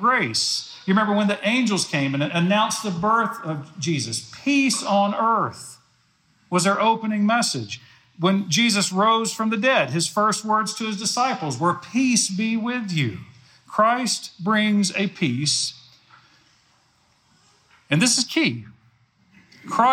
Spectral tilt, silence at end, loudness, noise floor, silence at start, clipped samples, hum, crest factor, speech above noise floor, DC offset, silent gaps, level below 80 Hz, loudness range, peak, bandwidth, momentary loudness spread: -3.5 dB/octave; 0 s; -21 LUFS; -62 dBFS; 0 s; under 0.1%; none; 18 dB; 41 dB; under 0.1%; none; -70 dBFS; 4 LU; -4 dBFS; 16 kHz; 8 LU